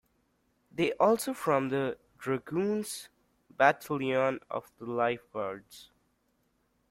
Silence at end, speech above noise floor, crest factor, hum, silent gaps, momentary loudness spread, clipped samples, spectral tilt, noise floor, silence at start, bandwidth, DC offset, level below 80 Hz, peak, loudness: 1.05 s; 44 dB; 24 dB; none; none; 13 LU; under 0.1%; -5 dB/octave; -74 dBFS; 0.75 s; 16.5 kHz; under 0.1%; -72 dBFS; -8 dBFS; -30 LUFS